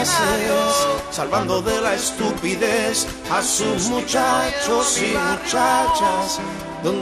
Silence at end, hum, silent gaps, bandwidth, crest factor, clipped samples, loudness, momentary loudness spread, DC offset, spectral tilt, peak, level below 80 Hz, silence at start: 0 s; none; none; 14 kHz; 14 dB; under 0.1%; -19 LUFS; 5 LU; under 0.1%; -2.5 dB/octave; -6 dBFS; -44 dBFS; 0 s